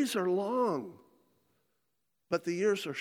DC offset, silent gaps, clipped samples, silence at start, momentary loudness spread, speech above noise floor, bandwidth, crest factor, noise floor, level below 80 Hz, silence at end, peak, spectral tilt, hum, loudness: under 0.1%; none; under 0.1%; 0 s; 7 LU; 52 dB; 18 kHz; 18 dB; -83 dBFS; -84 dBFS; 0 s; -16 dBFS; -5 dB/octave; none; -32 LUFS